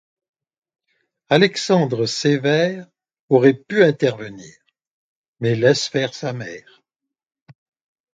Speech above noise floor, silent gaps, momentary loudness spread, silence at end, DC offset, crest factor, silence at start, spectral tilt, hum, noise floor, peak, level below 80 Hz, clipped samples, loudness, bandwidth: 67 dB; 3.19-3.28 s, 4.87-5.33 s; 17 LU; 1.55 s; under 0.1%; 20 dB; 1.3 s; -5.5 dB/octave; none; -85 dBFS; 0 dBFS; -64 dBFS; under 0.1%; -18 LUFS; 9.2 kHz